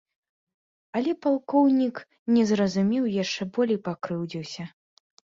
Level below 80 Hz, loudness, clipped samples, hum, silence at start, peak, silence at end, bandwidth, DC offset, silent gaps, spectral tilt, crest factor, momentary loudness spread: -68 dBFS; -25 LUFS; under 0.1%; none; 0.95 s; -10 dBFS; 0.65 s; 7.6 kHz; under 0.1%; 2.19-2.26 s; -6 dB/octave; 16 dB; 13 LU